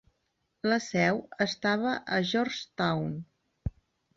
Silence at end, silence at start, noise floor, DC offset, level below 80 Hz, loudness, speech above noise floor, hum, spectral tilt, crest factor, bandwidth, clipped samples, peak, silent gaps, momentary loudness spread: 0.45 s; 0.65 s; -78 dBFS; under 0.1%; -52 dBFS; -29 LUFS; 49 dB; none; -5 dB/octave; 18 dB; 7.8 kHz; under 0.1%; -12 dBFS; none; 13 LU